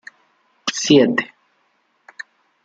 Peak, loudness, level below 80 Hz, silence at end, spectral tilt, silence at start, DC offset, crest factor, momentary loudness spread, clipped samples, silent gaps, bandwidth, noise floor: -2 dBFS; -17 LUFS; -64 dBFS; 1.4 s; -4 dB/octave; 0.65 s; under 0.1%; 20 dB; 24 LU; under 0.1%; none; 9 kHz; -64 dBFS